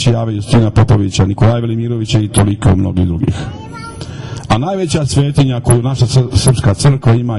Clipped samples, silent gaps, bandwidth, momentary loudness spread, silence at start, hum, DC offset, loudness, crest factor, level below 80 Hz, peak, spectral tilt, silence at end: under 0.1%; none; 11.5 kHz; 14 LU; 0 s; none; under 0.1%; -13 LUFS; 12 dB; -30 dBFS; 0 dBFS; -6 dB/octave; 0 s